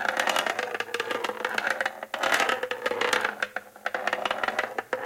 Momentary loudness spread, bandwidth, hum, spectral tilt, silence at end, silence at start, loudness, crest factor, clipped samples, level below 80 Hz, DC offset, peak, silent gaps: 7 LU; 17 kHz; none; -1 dB/octave; 0 s; 0 s; -28 LUFS; 22 dB; under 0.1%; -68 dBFS; under 0.1%; -8 dBFS; none